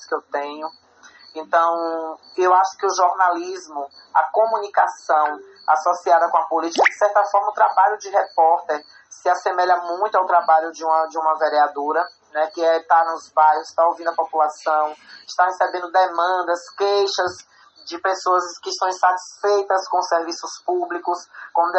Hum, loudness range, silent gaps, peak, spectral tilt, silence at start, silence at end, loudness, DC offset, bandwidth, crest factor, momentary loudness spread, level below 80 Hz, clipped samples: none; 3 LU; none; -4 dBFS; -1.5 dB/octave; 0 s; 0 s; -20 LUFS; under 0.1%; 8.2 kHz; 16 dB; 11 LU; -76 dBFS; under 0.1%